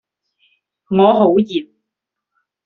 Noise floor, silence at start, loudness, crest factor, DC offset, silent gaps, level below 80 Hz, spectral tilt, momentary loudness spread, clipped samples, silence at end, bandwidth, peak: -81 dBFS; 0.9 s; -14 LUFS; 16 dB; under 0.1%; none; -58 dBFS; -6 dB/octave; 11 LU; under 0.1%; 1 s; 6.6 kHz; -2 dBFS